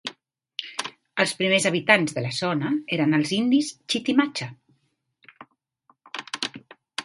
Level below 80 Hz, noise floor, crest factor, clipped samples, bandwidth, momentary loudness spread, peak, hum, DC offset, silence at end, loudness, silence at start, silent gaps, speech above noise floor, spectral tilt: -70 dBFS; -71 dBFS; 24 dB; under 0.1%; 11.5 kHz; 16 LU; 0 dBFS; none; under 0.1%; 0 s; -23 LUFS; 0.05 s; none; 48 dB; -4 dB/octave